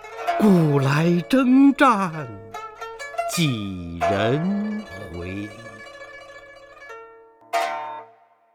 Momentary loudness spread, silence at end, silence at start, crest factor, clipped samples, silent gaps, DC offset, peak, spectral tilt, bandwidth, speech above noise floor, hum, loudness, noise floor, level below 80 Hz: 23 LU; 0.5 s; 0 s; 20 dB; under 0.1%; none; under 0.1%; -2 dBFS; -6.5 dB/octave; 16.5 kHz; 34 dB; none; -21 LUFS; -54 dBFS; -54 dBFS